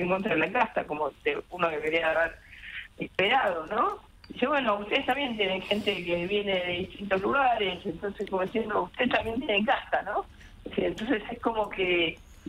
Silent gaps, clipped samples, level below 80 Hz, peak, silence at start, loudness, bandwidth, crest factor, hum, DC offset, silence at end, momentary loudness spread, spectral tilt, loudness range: none; under 0.1%; -54 dBFS; -10 dBFS; 0 s; -28 LUFS; 15.5 kHz; 18 dB; none; under 0.1%; 0 s; 9 LU; -5.5 dB/octave; 1 LU